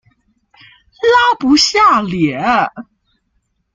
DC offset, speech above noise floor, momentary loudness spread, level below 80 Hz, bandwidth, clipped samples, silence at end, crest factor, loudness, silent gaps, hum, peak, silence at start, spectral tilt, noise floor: under 0.1%; 52 dB; 8 LU; -48 dBFS; 9.4 kHz; under 0.1%; 0.9 s; 14 dB; -12 LUFS; none; none; -2 dBFS; 1 s; -3.5 dB/octave; -65 dBFS